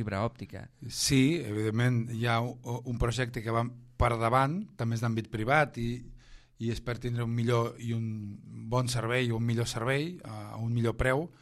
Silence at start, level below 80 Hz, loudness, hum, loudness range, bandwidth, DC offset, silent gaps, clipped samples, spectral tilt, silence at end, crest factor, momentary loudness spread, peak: 0 s; -46 dBFS; -30 LUFS; none; 3 LU; 13.5 kHz; under 0.1%; none; under 0.1%; -5.5 dB/octave; 0.15 s; 20 dB; 11 LU; -10 dBFS